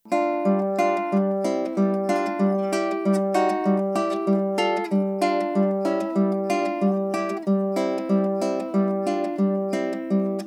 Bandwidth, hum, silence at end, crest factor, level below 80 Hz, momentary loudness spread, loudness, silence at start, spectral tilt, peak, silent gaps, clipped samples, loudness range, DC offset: 12 kHz; none; 0 s; 16 dB; under -90 dBFS; 3 LU; -23 LUFS; 0.05 s; -7 dB/octave; -8 dBFS; none; under 0.1%; 1 LU; under 0.1%